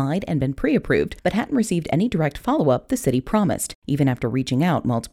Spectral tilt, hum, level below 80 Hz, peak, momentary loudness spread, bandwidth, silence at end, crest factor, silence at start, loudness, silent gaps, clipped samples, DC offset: -6.5 dB/octave; none; -42 dBFS; -6 dBFS; 3 LU; 16 kHz; 0.05 s; 16 dB; 0 s; -22 LUFS; 3.75-3.82 s; under 0.1%; under 0.1%